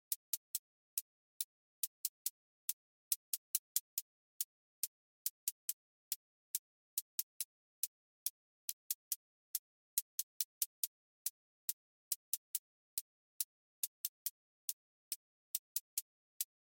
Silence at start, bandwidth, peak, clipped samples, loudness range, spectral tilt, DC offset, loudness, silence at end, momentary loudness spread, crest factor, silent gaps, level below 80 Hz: 0.1 s; 17 kHz; -16 dBFS; under 0.1%; 2 LU; 9 dB/octave; under 0.1%; -43 LUFS; 0.3 s; 6 LU; 30 dB; 0.16-16.40 s; under -90 dBFS